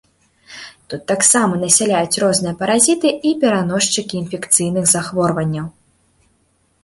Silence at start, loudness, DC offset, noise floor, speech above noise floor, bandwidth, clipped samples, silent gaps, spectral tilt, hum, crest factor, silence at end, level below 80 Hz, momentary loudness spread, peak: 0.5 s; -15 LUFS; under 0.1%; -61 dBFS; 45 dB; 16 kHz; under 0.1%; none; -3.5 dB/octave; none; 18 dB; 1.15 s; -54 dBFS; 16 LU; 0 dBFS